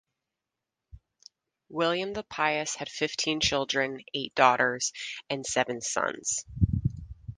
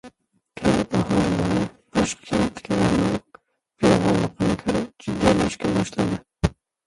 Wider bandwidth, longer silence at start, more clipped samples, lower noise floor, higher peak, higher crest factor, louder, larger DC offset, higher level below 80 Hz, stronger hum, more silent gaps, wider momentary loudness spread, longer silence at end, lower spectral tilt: about the same, 10.5 kHz vs 11.5 kHz; first, 0.95 s vs 0.05 s; neither; first, -87 dBFS vs -54 dBFS; second, -6 dBFS vs -2 dBFS; about the same, 24 dB vs 20 dB; second, -28 LUFS vs -23 LUFS; neither; second, -46 dBFS vs -40 dBFS; neither; neither; first, 11 LU vs 7 LU; second, 0.05 s vs 0.35 s; second, -3 dB/octave vs -6 dB/octave